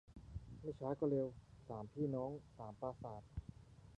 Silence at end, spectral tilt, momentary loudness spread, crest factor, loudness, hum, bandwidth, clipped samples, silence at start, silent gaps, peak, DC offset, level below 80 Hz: 0.05 s; -10 dB/octave; 16 LU; 18 dB; -46 LUFS; none; 9.8 kHz; under 0.1%; 0.1 s; none; -28 dBFS; under 0.1%; -62 dBFS